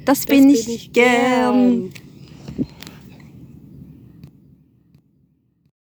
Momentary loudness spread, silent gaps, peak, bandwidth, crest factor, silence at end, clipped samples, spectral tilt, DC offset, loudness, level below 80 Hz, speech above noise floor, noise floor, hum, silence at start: 24 LU; none; 0 dBFS; over 20 kHz; 20 dB; 3 s; under 0.1%; -4.5 dB/octave; under 0.1%; -16 LUFS; -52 dBFS; 46 dB; -61 dBFS; none; 0.05 s